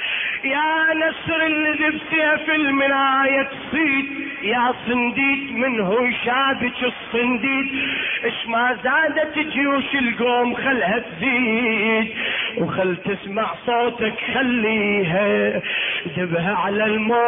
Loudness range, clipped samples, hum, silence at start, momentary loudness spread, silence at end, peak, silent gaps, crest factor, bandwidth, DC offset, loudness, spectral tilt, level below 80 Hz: 2 LU; under 0.1%; none; 0 s; 5 LU; 0 s; -8 dBFS; none; 12 dB; 3.8 kHz; under 0.1%; -19 LUFS; -8.5 dB/octave; -56 dBFS